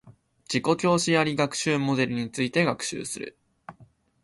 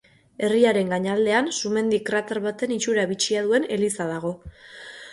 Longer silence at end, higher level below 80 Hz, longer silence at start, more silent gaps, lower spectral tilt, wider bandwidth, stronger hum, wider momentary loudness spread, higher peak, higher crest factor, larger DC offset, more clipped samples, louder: first, 0.4 s vs 0 s; about the same, -62 dBFS vs -58 dBFS; second, 0.05 s vs 0.4 s; neither; about the same, -4.5 dB/octave vs -4 dB/octave; about the same, 11.5 kHz vs 11.5 kHz; neither; second, 11 LU vs 15 LU; about the same, -8 dBFS vs -6 dBFS; about the same, 18 dB vs 18 dB; neither; neither; about the same, -25 LUFS vs -23 LUFS